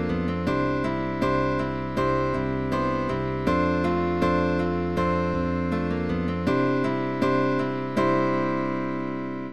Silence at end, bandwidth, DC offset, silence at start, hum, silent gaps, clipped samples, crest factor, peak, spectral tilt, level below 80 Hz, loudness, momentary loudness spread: 0 s; 12.5 kHz; 0.8%; 0 s; none; none; under 0.1%; 14 dB; -10 dBFS; -8 dB/octave; -44 dBFS; -25 LUFS; 4 LU